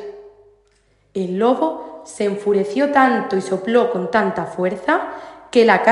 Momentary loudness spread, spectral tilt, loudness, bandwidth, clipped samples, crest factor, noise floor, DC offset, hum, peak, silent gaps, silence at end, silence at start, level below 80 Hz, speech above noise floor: 16 LU; -5.5 dB/octave; -18 LUFS; 11.5 kHz; under 0.1%; 18 dB; -59 dBFS; under 0.1%; none; 0 dBFS; none; 0 s; 0 s; -62 dBFS; 42 dB